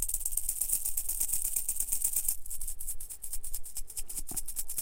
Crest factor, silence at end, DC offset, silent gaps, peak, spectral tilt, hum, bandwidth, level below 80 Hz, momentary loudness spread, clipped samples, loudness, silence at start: 20 dB; 0 s; under 0.1%; none; -12 dBFS; 0 dB/octave; none; 17 kHz; -42 dBFS; 10 LU; under 0.1%; -32 LUFS; 0 s